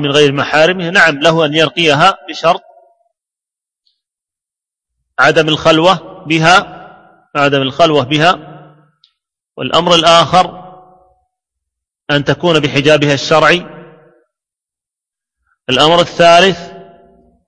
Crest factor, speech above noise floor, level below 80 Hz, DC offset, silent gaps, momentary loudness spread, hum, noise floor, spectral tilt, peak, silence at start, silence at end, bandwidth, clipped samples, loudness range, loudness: 12 dB; 76 dB; -48 dBFS; under 0.1%; none; 9 LU; none; -86 dBFS; -4.5 dB/octave; 0 dBFS; 0 s; 0.65 s; 11 kHz; 0.3%; 4 LU; -10 LUFS